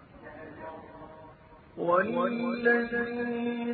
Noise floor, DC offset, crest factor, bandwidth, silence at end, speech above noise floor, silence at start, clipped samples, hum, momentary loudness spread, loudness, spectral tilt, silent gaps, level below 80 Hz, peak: -53 dBFS; under 0.1%; 20 dB; 4.6 kHz; 0 s; 25 dB; 0.15 s; under 0.1%; none; 22 LU; -28 LUFS; -9.5 dB/octave; none; -62 dBFS; -12 dBFS